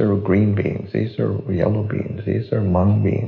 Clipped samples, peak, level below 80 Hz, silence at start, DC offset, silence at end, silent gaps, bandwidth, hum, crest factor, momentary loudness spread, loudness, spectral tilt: under 0.1%; -4 dBFS; -46 dBFS; 0 s; under 0.1%; 0 s; none; 4.6 kHz; none; 14 dB; 7 LU; -20 LUFS; -9.5 dB/octave